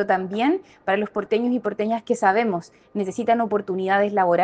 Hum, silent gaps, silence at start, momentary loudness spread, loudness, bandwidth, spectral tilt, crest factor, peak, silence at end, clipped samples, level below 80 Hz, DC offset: none; none; 0 s; 7 LU; -22 LUFS; 9.4 kHz; -6 dB/octave; 18 dB; -4 dBFS; 0 s; under 0.1%; -66 dBFS; under 0.1%